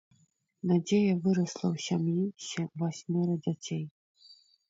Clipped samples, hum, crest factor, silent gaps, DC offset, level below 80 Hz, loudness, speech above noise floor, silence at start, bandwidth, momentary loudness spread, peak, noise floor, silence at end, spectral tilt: under 0.1%; none; 14 dB; 3.91-4.15 s; under 0.1%; -72 dBFS; -31 LUFS; 40 dB; 0.65 s; 7.8 kHz; 10 LU; -16 dBFS; -70 dBFS; 0.35 s; -6.5 dB/octave